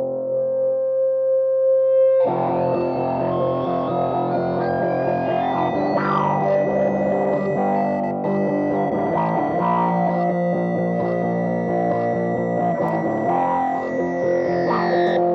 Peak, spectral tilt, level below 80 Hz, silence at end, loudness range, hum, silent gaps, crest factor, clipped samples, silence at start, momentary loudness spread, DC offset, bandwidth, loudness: -8 dBFS; -9 dB/octave; -56 dBFS; 0 s; 2 LU; none; none; 12 dB; under 0.1%; 0 s; 4 LU; under 0.1%; 6.2 kHz; -20 LUFS